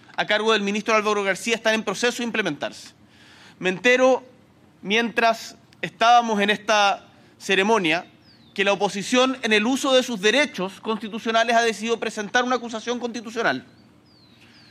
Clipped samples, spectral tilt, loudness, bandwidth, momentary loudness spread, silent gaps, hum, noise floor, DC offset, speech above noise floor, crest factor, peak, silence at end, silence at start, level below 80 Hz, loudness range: under 0.1%; -3 dB/octave; -21 LUFS; 15 kHz; 11 LU; none; none; -54 dBFS; under 0.1%; 32 dB; 18 dB; -6 dBFS; 1.05 s; 0.2 s; -72 dBFS; 3 LU